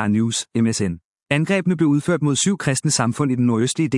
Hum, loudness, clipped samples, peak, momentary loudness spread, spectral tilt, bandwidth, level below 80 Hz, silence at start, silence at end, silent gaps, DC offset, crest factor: none; -19 LUFS; under 0.1%; -2 dBFS; 4 LU; -5 dB/octave; 12 kHz; -58 dBFS; 0 s; 0 s; 1.04-1.15 s, 1.22-1.26 s; under 0.1%; 16 dB